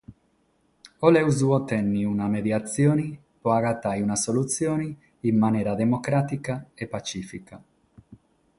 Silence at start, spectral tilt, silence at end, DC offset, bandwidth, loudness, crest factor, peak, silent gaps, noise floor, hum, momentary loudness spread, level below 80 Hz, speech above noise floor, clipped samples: 0.1 s; -6 dB/octave; 0.45 s; under 0.1%; 11.5 kHz; -24 LUFS; 22 dB; -4 dBFS; none; -67 dBFS; none; 13 LU; -58 dBFS; 43 dB; under 0.1%